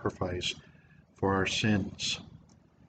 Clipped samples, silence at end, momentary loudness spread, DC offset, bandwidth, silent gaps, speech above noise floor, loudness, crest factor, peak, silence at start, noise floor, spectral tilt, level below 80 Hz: under 0.1%; 0.5 s; 8 LU; under 0.1%; 9.2 kHz; none; 28 dB; -31 LUFS; 18 dB; -14 dBFS; 0 s; -59 dBFS; -4.5 dB/octave; -60 dBFS